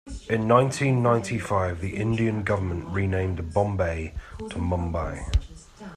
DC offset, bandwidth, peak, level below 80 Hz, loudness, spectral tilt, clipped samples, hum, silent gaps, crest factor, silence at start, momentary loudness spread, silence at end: under 0.1%; 12.5 kHz; -6 dBFS; -38 dBFS; -25 LUFS; -7 dB/octave; under 0.1%; none; none; 20 dB; 0.05 s; 10 LU; 0 s